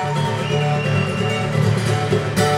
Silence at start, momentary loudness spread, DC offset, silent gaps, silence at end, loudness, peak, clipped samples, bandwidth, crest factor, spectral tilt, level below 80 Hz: 0 s; 2 LU; under 0.1%; none; 0 s; -19 LUFS; -4 dBFS; under 0.1%; 14.5 kHz; 14 dB; -6 dB/octave; -46 dBFS